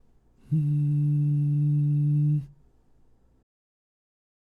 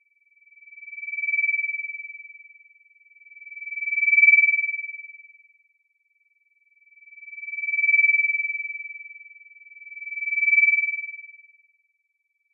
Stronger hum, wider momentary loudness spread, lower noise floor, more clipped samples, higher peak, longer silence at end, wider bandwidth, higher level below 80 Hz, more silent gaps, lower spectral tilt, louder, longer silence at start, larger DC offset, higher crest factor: neither; second, 6 LU vs 25 LU; second, -59 dBFS vs -74 dBFS; neither; second, -16 dBFS vs -6 dBFS; first, 1.95 s vs 1.15 s; about the same, 2.7 kHz vs 2.6 kHz; first, -60 dBFS vs under -90 dBFS; neither; first, -12 dB/octave vs 16.5 dB/octave; second, -25 LUFS vs -20 LUFS; second, 0.5 s vs 0.75 s; neither; second, 10 dB vs 20 dB